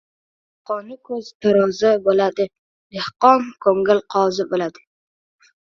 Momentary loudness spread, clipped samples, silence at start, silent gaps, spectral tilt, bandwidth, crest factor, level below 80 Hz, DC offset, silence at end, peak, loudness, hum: 14 LU; under 0.1%; 0.7 s; 1.35-1.40 s, 2.59-2.90 s; -5.5 dB/octave; 7.4 kHz; 20 dB; -64 dBFS; under 0.1%; 0.95 s; 0 dBFS; -19 LUFS; none